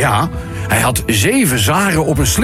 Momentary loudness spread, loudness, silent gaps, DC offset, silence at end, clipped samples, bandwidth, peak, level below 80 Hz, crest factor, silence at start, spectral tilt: 5 LU; -14 LUFS; none; under 0.1%; 0 s; under 0.1%; 16.5 kHz; -2 dBFS; -28 dBFS; 12 dB; 0 s; -4 dB/octave